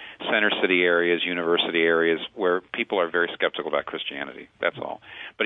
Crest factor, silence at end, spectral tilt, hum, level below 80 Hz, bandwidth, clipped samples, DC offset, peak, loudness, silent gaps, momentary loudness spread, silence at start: 18 dB; 0 s; -7 dB/octave; none; -70 dBFS; 4 kHz; under 0.1%; under 0.1%; -6 dBFS; -23 LUFS; none; 14 LU; 0 s